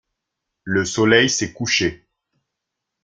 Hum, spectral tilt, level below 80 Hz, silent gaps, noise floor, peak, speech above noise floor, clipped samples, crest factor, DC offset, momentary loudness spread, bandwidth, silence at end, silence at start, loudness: none; -3.5 dB/octave; -54 dBFS; none; -81 dBFS; -2 dBFS; 63 dB; under 0.1%; 20 dB; under 0.1%; 10 LU; 10 kHz; 1.1 s; 0.65 s; -18 LUFS